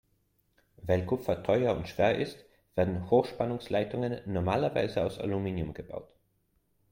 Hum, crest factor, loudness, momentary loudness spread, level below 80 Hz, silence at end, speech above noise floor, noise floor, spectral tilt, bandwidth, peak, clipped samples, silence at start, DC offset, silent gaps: none; 20 dB; -30 LUFS; 10 LU; -58 dBFS; 0.85 s; 43 dB; -73 dBFS; -7.5 dB/octave; 16.5 kHz; -12 dBFS; under 0.1%; 0.8 s; under 0.1%; none